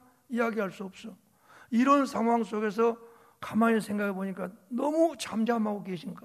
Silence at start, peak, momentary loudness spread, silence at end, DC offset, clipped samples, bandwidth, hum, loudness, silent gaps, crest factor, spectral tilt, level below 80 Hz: 0.3 s; -10 dBFS; 16 LU; 0.05 s; under 0.1%; under 0.1%; 14 kHz; none; -29 LUFS; none; 20 dB; -6 dB/octave; -76 dBFS